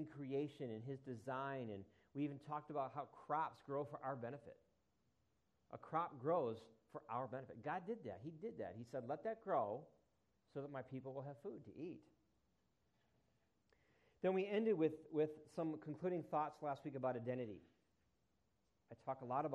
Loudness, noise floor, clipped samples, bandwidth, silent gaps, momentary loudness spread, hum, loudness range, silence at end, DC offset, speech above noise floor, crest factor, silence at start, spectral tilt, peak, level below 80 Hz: -46 LUFS; -84 dBFS; under 0.1%; 10.5 kHz; none; 13 LU; none; 9 LU; 0 s; under 0.1%; 39 dB; 20 dB; 0 s; -8.5 dB/octave; -26 dBFS; -86 dBFS